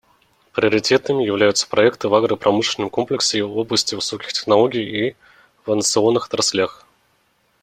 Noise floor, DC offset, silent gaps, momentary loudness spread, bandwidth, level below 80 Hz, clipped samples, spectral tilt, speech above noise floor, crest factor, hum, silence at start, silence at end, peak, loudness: -63 dBFS; under 0.1%; none; 7 LU; 16 kHz; -60 dBFS; under 0.1%; -3 dB/octave; 44 dB; 18 dB; none; 0.55 s; 0.9 s; 0 dBFS; -18 LUFS